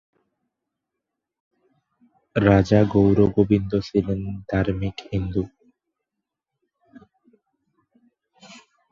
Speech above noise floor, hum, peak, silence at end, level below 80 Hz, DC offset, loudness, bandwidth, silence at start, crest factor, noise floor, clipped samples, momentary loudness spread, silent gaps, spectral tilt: 64 dB; none; -2 dBFS; 0.4 s; -42 dBFS; under 0.1%; -21 LUFS; 7.4 kHz; 2.35 s; 22 dB; -84 dBFS; under 0.1%; 12 LU; none; -8.5 dB/octave